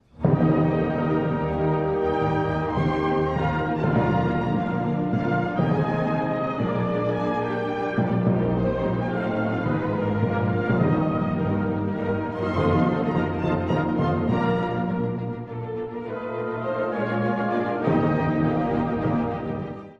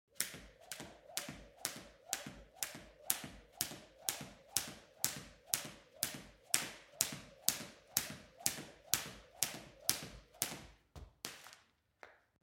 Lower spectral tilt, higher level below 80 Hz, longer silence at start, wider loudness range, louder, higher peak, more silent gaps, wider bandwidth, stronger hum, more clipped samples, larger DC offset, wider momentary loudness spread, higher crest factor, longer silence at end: first, -9.5 dB/octave vs -0.5 dB/octave; first, -44 dBFS vs -68 dBFS; about the same, 0.15 s vs 0.15 s; about the same, 2 LU vs 4 LU; first, -24 LUFS vs -41 LUFS; second, -8 dBFS vs -4 dBFS; neither; second, 6.8 kHz vs 17 kHz; neither; neither; neither; second, 5 LU vs 16 LU; second, 16 dB vs 42 dB; second, 0.05 s vs 0.3 s